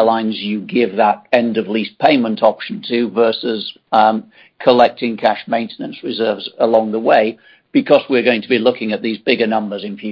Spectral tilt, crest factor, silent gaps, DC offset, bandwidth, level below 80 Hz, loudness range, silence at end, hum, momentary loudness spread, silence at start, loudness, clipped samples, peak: -7.5 dB/octave; 16 dB; none; under 0.1%; 6.4 kHz; -62 dBFS; 1 LU; 0 s; none; 8 LU; 0 s; -16 LUFS; under 0.1%; 0 dBFS